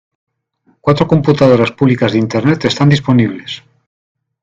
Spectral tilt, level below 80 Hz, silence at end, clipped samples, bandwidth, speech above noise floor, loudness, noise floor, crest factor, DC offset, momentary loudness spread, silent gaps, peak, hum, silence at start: -7 dB/octave; -46 dBFS; 0.85 s; under 0.1%; 7.6 kHz; 46 dB; -12 LUFS; -57 dBFS; 14 dB; under 0.1%; 10 LU; none; 0 dBFS; none; 0.85 s